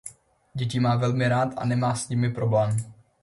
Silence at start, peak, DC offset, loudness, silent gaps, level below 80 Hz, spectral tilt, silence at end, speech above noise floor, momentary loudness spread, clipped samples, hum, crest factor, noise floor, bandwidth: 0.05 s; -10 dBFS; under 0.1%; -25 LUFS; none; -56 dBFS; -6.5 dB/octave; 0.3 s; 23 dB; 11 LU; under 0.1%; none; 14 dB; -47 dBFS; 11.5 kHz